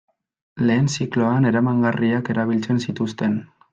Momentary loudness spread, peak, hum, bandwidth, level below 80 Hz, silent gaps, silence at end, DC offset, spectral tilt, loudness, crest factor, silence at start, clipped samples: 6 LU; -6 dBFS; none; 8 kHz; -60 dBFS; none; 0.25 s; under 0.1%; -6.5 dB/octave; -21 LUFS; 14 dB; 0.55 s; under 0.1%